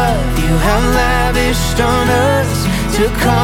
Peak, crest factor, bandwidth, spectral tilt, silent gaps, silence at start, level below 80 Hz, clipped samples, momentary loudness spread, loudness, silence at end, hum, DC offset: 0 dBFS; 12 dB; 17 kHz; -5 dB/octave; none; 0 s; -20 dBFS; under 0.1%; 3 LU; -14 LUFS; 0 s; none; under 0.1%